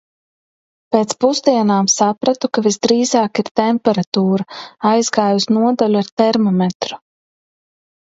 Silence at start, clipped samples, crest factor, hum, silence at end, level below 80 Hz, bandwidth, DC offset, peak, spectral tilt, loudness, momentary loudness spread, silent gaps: 0.9 s; under 0.1%; 16 dB; none; 1.2 s; -62 dBFS; 8 kHz; under 0.1%; 0 dBFS; -4.5 dB/octave; -16 LUFS; 6 LU; 3.51-3.55 s, 4.07-4.12 s, 6.12-6.17 s, 6.75-6.80 s